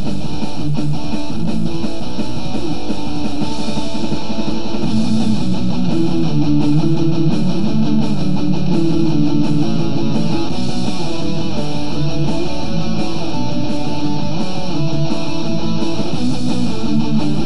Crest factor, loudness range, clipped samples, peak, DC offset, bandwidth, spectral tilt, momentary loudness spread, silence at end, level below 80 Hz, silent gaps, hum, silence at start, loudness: 14 dB; 5 LU; under 0.1%; -2 dBFS; 20%; 11.5 kHz; -7 dB/octave; 7 LU; 0 s; -36 dBFS; none; none; 0 s; -19 LUFS